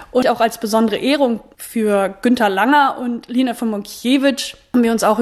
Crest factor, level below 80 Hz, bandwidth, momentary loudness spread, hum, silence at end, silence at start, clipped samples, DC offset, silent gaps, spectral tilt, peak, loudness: 16 dB; -54 dBFS; 14 kHz; 9 LU; none; 0 s; 0 s; under 0.1%; under 0.1%; none; -4 dB/octave; -2 dBFS; -17 LUFS